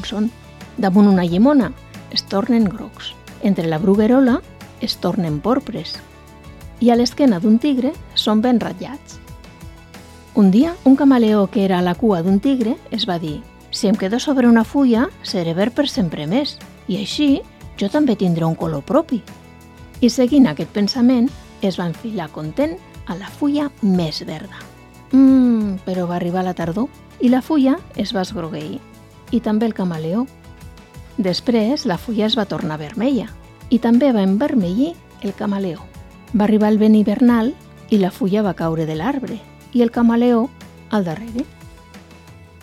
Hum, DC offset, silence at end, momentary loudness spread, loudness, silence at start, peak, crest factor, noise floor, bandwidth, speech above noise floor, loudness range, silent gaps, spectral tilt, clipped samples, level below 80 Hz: none; under 0.1%; 0.2 s; 15 LU; -18 LUFS; 0 s; -2 dBFS; 16 dB; -42 dBFS; 14 kHz; 25 dB; 4 LU; none; -6.5 dB/octave; under 0.1%; -46 dBFS